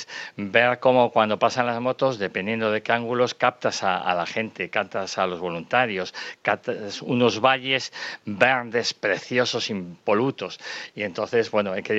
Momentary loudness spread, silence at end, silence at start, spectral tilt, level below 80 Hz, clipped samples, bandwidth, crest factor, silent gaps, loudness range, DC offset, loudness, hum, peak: 11 LU; 0 s; 0 s; -4.5 dB/octave; -70 dBFS; under 0.1%; 8.2 kHz; 22 dB; none; 3 LU; under 0.1%; -23 LUFS; none; -2 dBFS